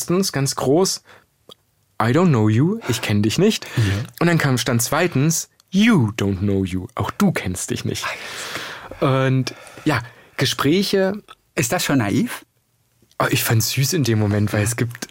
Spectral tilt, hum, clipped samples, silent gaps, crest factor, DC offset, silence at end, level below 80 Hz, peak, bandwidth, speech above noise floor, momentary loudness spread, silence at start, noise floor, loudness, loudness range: -5 dB/octave; none; under 0.1%; none; 16 dB; under 0.1%; 0.05 s; -54 dBFS; -4 dBFS; 16.5 kHz; 45 dB; 10 LU; 0 s; -64 dBFS; -20 LUFS; 4 LU